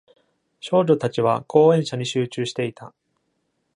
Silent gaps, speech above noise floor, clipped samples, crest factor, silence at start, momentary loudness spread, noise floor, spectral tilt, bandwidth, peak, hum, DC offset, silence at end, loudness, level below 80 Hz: none; 52 dB; under 0.1%; 20 dB; 0.65 s; 11 LU; -72 dBFS; -6 dB/octave; 10.5 kHz; -2 dBFS; none; under 0.1%; 0.9 s; -21 LUFS; -66 dBFS